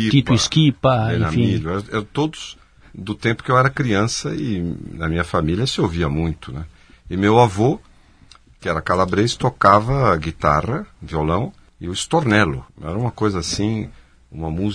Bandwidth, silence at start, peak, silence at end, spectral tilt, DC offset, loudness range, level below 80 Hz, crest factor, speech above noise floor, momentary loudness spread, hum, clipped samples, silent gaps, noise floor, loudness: 10.5 kHz; 0 s; 0 dBFS; 0 s; -5.5 dB/octave; under 0.1%; 3 LU; -38 dBFS; 20 dB; 30 dB; 15 LU; none; under 0.1%; none; -48 dBFS; -19 LUFS